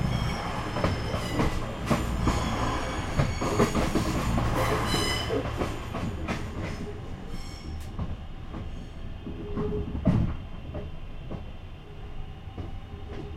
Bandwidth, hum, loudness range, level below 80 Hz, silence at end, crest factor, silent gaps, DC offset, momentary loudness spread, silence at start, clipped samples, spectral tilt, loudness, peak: 16 kHz; none; 10 LU; -36 dBFS; 0 s; 20 dB; none; under 0.1%; 15 LU; 0 s; under 0.1%; -5.5 dB/octave; -30 LUFS; -10 dBFS